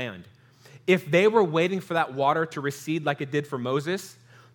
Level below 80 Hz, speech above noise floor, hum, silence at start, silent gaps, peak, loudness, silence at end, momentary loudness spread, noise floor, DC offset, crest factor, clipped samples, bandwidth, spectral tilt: -78 dBFS; 27 dB; none; 0 s; none; -6 dBFS; -25 LUFS; 0.45 s; 13 LU; -52 dBFS; under 0.1%; 20 dB; under 0.1%; 19 kHz; -6 dB/octave